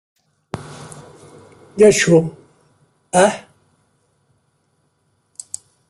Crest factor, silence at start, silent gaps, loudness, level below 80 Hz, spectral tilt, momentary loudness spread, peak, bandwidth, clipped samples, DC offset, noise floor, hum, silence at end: 20 dB; 0.55 s; none; -14 LUFS; -56 dBFS; -4.5 dB/octave; 25 LU; -2 dBFS; 12.5 kHz; under 0.1%; under 0.1%; -65 dBFS; none; 2.5 s